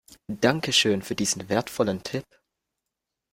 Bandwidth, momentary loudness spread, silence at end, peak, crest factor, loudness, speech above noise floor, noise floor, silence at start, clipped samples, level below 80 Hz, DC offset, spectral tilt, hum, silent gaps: 16.5 kHz; 13 LU; 1.1 s; -4 dBFS; 22 dB; -25 LUFS; 60 dB; -85 dBFS; 0.3 s; under 0.1%; -60 dBFS; under 0.1%; -3.5 dB/octave; none; none